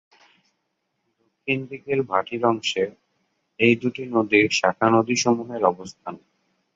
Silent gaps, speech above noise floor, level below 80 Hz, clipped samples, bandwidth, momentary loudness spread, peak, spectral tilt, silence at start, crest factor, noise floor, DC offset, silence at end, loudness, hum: none; 54 dB; -64 dBFS; under 0.1%; 7.8 kHz; 13 LU; -4 dBFS; -4.5 dB/octave; 1.45 s; 20 dB; -75 dBFS; under 0.1%; 0.6 s; -22 LUFS; none